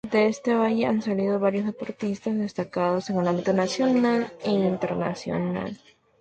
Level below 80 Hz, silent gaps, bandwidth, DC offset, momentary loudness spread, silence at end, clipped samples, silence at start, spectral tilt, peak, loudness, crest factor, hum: -62 dBFS; none; 9 kHz; under 0.1%; 7 LU; 0.45 s; under 0.1%; 0.05 s; -6.5 dB/octave; -10 dBFS; -25 LUFS; 14 dB; none